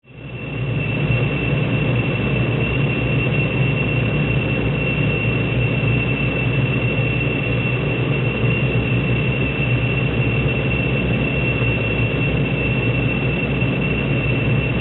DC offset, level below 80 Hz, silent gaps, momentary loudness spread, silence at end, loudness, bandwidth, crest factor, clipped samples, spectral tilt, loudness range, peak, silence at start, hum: under 0.1%; -32 dBFS; none; 1 LU; 0 s; -19 LUFS; 4.1 kHz; 12 dB; under 0.1%; -6 dB/octave; 0 LU; -6 dBFS; 0.1 s; none